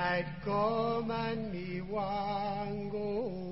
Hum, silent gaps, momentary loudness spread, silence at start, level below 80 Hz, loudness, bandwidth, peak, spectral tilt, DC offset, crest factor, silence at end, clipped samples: none; none; 6 LU; 0 s; -58 dBFS; -35 LUFS; 5.8 kHz; -18 dBFS; -5 dB/octave; 0.3%; 16 dB; 0 s; under 0.1%